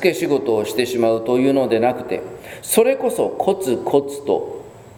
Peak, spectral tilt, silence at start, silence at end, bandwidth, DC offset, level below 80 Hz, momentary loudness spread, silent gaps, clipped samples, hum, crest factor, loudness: 0 dBFS; -4.5 dB/octave; 0 s; 0.05 s; over 20 kHz; under 0.1%; -58 dBFS; 11 LU; none; under 0.1%; none; 18 dB; -19 LUFS